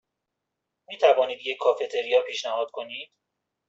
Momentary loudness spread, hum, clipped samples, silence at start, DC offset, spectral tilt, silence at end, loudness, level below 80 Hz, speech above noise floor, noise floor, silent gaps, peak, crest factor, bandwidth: 17 LU; none; under 0.1%; 0.9 s; under 0.1%; -1 dB/octave; 0.65 s; -25 LUFS; -78 dBFS; 59 dB; -83 dBFS; none; -6 dBFS; 22 dB; 7.8 kHz